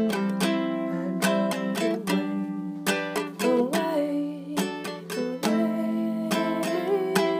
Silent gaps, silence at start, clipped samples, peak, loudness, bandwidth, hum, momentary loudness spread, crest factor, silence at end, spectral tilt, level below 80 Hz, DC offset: none; 0 s; under 0.1%; -4 dBFS; -27 LUFS; 15.5 kHz; none; 6 LU; 22 dB; 0 s; -5 dB/octave; -74 dBFS; under 0.1%